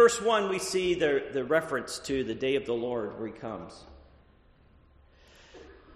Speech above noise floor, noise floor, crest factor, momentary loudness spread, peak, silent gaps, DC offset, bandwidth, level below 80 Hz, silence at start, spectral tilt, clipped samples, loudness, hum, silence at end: 30 dB; -60 dBFS; 20 dB; 14 LU; -10 dBFS; none; under 0.1%; 13 kHz; -58 dBFS; 0 s; -3.5 dB/octave; under 0.1%; -29 LUFS; none; 0.2 s